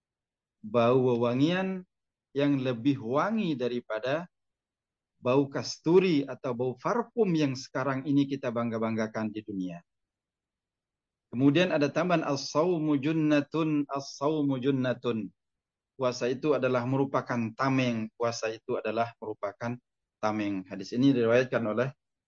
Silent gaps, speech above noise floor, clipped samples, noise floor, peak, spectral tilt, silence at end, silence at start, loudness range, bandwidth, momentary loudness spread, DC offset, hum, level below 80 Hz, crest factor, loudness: none; over 62 dB; under 0.1%; under -90 dBFS; -12 dBFS; -6.5 dB/octave; 0.35 s; 0.65 s; 4 LU; 7.4 kHz; 11 LU; under 0.1%; none; -74 dBFS; 18 dB; -29 LUFS